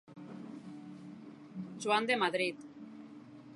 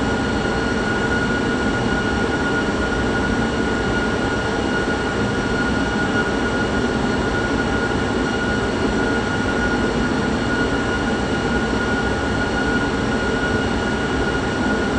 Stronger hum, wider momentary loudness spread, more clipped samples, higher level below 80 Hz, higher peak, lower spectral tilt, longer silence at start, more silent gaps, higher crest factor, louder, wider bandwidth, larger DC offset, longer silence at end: neither; first, 21 LU vs 1 LU; neither; second, -84 dBFS vs -32 dBFS; second, -16 dBFS vs -6 dBFS; second, -4 dB/octave vs -5.5 dB/octave; about the same, 0.05 s vs 0 s; neither; first, 22 dB vs 14 dB; second, -33 LUFS vs -20 LUFS; first, 11.5 kHz vs 9.8 kHz; neither; about the same, 0 s vs 0 s